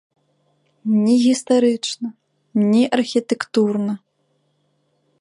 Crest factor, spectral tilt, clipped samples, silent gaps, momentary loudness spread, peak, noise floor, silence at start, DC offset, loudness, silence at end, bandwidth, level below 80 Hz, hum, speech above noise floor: 16 dB; -5.5 dB/octave; under 0.1%; none; 13 LU; -4 dBFS; -67 dBFS; 0.85 s; under 0.1%; -19 LUFS; 1.25 s; 11.5 kHz; -72 dBFS; none; 49 dB